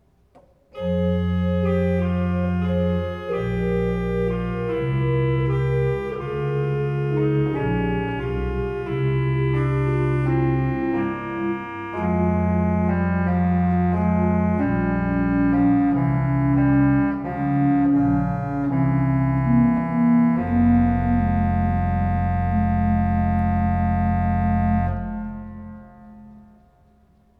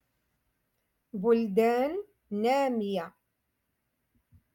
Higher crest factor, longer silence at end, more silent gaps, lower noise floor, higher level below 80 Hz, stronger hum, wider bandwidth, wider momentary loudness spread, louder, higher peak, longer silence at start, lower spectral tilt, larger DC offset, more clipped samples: about the same, 14 dB vs 18 dB; second, 1 s vs 1.45 s; neither; second, -56 dBFS vs -80 dBFS; first, -34 dBFS vs -72 dBFS; neither; second, 4.8 kHz vs 17.5 kHz; second, 8 LU vs 13 LU; first, -21 LUFS vs -28 LUFS; first, -8 dBFS vs -14 dBFS; second, 0.75 s vs 1.15 s; first, -10.5 dB/octave vs -6.5 dB/octave; neither; neither